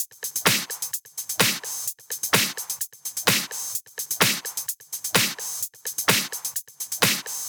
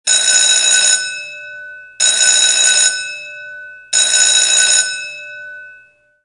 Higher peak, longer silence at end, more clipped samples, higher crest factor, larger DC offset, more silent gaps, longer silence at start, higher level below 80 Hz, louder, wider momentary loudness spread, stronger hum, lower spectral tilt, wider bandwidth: about the same, 0 dBFS vs 0 dBFS; second, 0 s vs 0.55 s; neither; first, 26 dB vs 14 dB; neither; neither; about the same, 0 s vs 0.05 s; about the same, -66 dBFS vs -70 dBFS; second, -24 LUFS vs -10 LUFS; second, 9 LU vs 21 LU; neither; first, -1 dB/octave vs 4.5 dB/octave; first, over 20 kHz vs 15.5 kHz